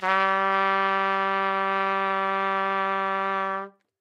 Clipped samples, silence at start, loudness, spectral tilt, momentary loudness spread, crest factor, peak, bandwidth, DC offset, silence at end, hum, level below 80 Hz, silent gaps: under 0.1%; 0 s; -24 LUFS; -5 dB/octave; 5 LU; 18 dB; -8 dBFS; 9 kHz; under 0.1%; 0.3 s; none; under -90 dBFS; none